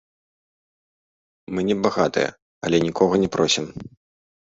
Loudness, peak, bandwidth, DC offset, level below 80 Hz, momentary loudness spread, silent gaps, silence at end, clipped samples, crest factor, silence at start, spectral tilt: -21 LUFS; -4 dBFS; 8 kHz; under 0.1%; -54 dBFS; 12 LU; 2.42-2.61 s; 0.7 s; under 0.1%; 20 dB; 1.5 s; -4.5 dB/octave